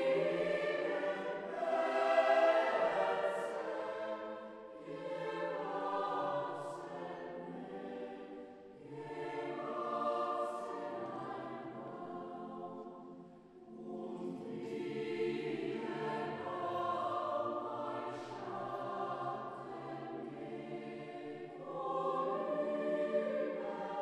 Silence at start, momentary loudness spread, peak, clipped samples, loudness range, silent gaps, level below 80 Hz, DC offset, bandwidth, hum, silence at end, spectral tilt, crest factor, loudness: 0 s; 14 LU; -18 dBFS; under 0.1%; 11 LU; none; -82 dBFS; under 0.1%; 11 kHz; none; 0 s; -6 dB/octave; 20 dB; -39 LUFS